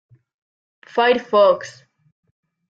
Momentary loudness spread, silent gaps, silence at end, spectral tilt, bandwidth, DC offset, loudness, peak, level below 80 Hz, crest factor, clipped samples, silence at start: 11 LU; none; 1 s; -4 dB/octave; 7.8 kHz; under 0.1%; -17 LUFS; -4 dBFS; -70 dBFS; 18 dB; under 0.1%; 0.95 s